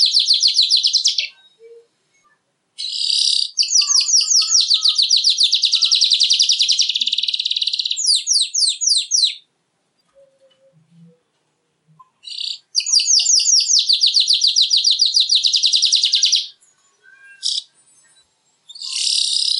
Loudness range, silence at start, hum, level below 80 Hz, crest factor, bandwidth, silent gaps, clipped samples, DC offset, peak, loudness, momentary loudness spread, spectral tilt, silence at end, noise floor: 9 LU; 0 s; none; under -90 dBFS; 16 dB; 11.5 kHz; none; under 0.1%; under 0.1%; -2 dBFS; -13 LUFS; 10 LU; 5.5 dB/octave; 0 s; -68 dBFS